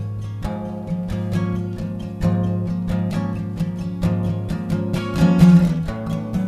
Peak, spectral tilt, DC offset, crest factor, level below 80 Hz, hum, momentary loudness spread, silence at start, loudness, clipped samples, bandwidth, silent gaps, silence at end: 0 dBFS; -8.5 dB/octave; under 0.1%; 18 dB; -36 dBFS; none; 14 LU; 0 s; -21 LUFS; under 0.1%; 12 kHz; none; 0 s